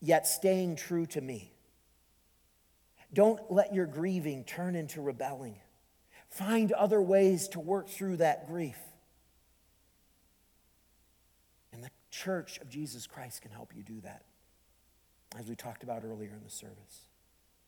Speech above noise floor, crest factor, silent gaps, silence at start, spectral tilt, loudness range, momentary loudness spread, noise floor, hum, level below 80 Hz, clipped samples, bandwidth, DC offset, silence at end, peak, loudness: 37 dB; 22 dB; none; 0 s; -5 dB/octave; 16 LU; 22 LU; -69 dBFS; none; -74 dBFS; under 0.1%; 19 kHz; under 0.1%; 0.7 s; -12 dBFS; -32 LUFS